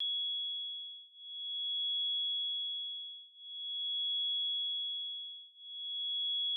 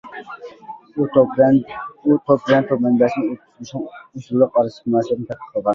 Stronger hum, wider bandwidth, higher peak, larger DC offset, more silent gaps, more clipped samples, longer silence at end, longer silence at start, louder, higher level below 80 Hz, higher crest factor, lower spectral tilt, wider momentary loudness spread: neither; second, 3.6 kHz vs 7.2 kHz; second, -32 dBFS vs -2 dBFS; neither; neither; neither; about the same, 0 s vs 0 s; about the same, 0 s vs 0.05 s; second, -34 LUFS vs -18 LUFS; second, under -90 dBFS vs -60 dBFS; second, 6 dB vs 16 dB; second, 0 dB/octave vs -8 dB/octave; second, 14 LU vs 19 LU